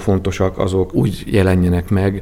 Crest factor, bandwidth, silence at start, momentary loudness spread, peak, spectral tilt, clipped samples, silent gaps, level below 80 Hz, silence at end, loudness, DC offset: 14 dB; 15.5 kHz; 0 s; 4 LU; 0 dBFS; -7.5 dB/octave; under 0.1%; none; -32 dBFS; 0 s; -17 LUFS; under 0.1%